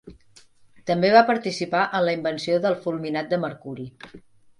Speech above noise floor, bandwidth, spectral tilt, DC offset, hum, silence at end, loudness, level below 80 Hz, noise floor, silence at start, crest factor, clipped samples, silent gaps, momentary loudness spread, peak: 31 dB; 11 kHz; -5.5 dB/octave; under 0.1%; none; 0.4 s; -22 LUFS; -62 dBFS; -53 dBFS; 0.05 s; 22 dB; under 0.1%; none; 19 LU; -2 dBFS